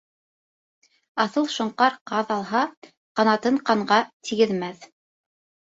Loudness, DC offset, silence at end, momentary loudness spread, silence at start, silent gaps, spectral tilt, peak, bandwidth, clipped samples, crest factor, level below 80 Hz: -23 LUFS; under 0.1%; 0.9 s; 9 LU; 1.15 s; 2.01-2.06 s, 2.77-2.82 s, 2.97-3.15 s, 4.13-4.20 s; -4.5 dB/octave; -4 dBFS; 8 kHz; under 0.1%; 20 dB; -70 dBFS